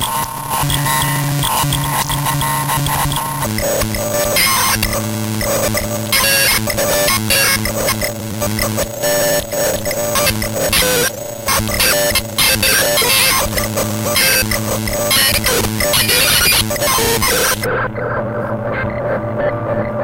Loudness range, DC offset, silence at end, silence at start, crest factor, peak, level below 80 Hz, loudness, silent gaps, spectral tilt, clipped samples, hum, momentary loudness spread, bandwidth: 4 LU; under 0.1%; 0 s; 0 s; 16 dB; 0 dBFS; -32 dBFS; -14 LUFS; none; -2.5 dB/octave; under 0.1%; none; 9 LU; 17 kHz